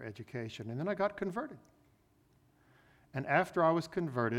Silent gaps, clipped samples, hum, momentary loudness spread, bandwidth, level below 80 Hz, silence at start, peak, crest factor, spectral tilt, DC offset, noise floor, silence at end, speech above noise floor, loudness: none; under 0.1%; none; 13 LU; 15.5 kHz; -70 dBFS; 0 s; -14 dBFS; 22 dB; -7 dB/octave; under 0.1%; -69 dBFS; 0 s; 35 dB; -35 LUFS